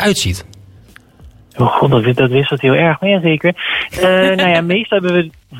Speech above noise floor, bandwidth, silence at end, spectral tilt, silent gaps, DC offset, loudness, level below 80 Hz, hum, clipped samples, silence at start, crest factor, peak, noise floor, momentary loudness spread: 30 dB; 16.5 kHz; 0 s; -5.5 dB/octave; none; under 0.1%; -13 LUFS; -42 dBFS; none; under 0.1%; 0 s; 14 dB; 0 dBFS; -43 dBFS; 6 LU